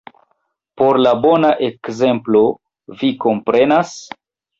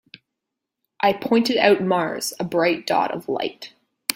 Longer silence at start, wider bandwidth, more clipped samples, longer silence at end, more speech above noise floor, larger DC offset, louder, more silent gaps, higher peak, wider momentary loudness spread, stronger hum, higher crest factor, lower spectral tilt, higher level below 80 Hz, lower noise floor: second, 0.75 s vs 1 s; second, 7.8 kHz vs 16.5 kHz; neither; first, 0.55 s vs 0 s; second, 53 dB vs 62 dB; neither; first, -15 LUFS vs -21 LUFS; neither; about the same, -2 dBFS vs 0 dBFS; about the same, 11 LU vs 11 LU; neither; second, 14 dB vs 22 dB; first, -6 dB/octave vs -4 dB/octave; first, -58 dBFS vs -66 dBFS; second, -67 dBFS vs -83 dBFS